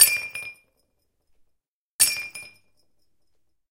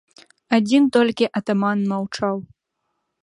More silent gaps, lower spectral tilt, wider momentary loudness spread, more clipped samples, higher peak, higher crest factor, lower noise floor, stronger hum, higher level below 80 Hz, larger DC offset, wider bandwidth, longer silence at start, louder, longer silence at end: first, 1.68-1.99 s vs none; second, 3 dB/octave vs -6 dB/octave; first, 20 LU vs 9 LU; neither; about the same, 0 dBFS vs -2 dBFS; first, 28 dB vs 20 dB; about the same, -75 dBFS vs -76 dBFS; neither; about the same, -64 dBFS vs -64 dBFS; neither; first, 16.5 kHz vs 11 kHz; second, 0 s vs 0.5 s; about the same, -21 LUFS vs -20 LUFS; first, 1.25 s vs 0.8 s